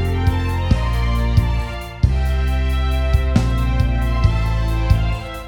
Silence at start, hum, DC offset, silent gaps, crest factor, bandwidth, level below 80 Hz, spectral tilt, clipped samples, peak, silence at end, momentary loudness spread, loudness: 0 s; none; under 0.1%; none; 16 dB; 16 kHz; -18 dBFS; -7 dB/octave; under 0.1%; -2 dBFS; 0 s; 3 LU; -19 LUFS